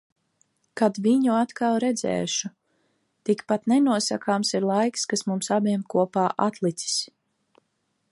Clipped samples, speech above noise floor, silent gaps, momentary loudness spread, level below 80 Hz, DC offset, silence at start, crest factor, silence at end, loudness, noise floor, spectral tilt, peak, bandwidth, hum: under 0.1%; 51 dB; none; 7 LU; -72 dBFS; under 0.1%; 0.75 s; 18 dB; 1.05 s; -24 LUFS; -74 dBFS; -4.5 dB/octave; -6 dBFS; 11.5 kHz; none